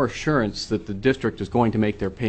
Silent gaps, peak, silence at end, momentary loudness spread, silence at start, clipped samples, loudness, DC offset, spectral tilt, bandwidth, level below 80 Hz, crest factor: none; -6 dBFS; 0 s; 4 LU; 0 s; under 0.1%; -23 LUFS; under 0.1%; -6.5 dB/octave; 8.6 kHz; -44 dBFS; 16 dB